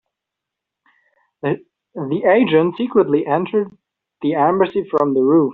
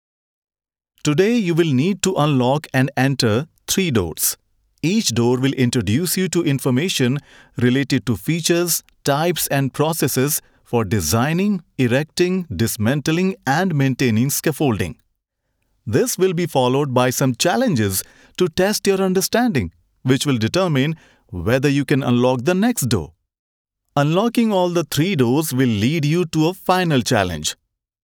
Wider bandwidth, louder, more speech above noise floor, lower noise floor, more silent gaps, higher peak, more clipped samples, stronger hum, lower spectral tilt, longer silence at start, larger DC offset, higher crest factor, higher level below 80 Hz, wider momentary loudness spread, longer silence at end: second, 4.2 kHz vs over 20 kHz; about the same, -17 LUFS vs -19 LUFS; first, 67 dB vs 55 dB; first, -83 dBFS vs -73 dBFS; second, none vs 23.39-23.65 s; about the same, -2 dBFS vs -2 dBFS; neither; neither; about the same, -5.5 dB/octave vs -5 dB/octave; first, 1.45 s vs 1.05 s; neither; about the same, 16 dB vs 16 dB; second, -62 dBFS vs -52 dBFS; first, 12 LU vs 6 LU; second, 0 s vs 0.5 s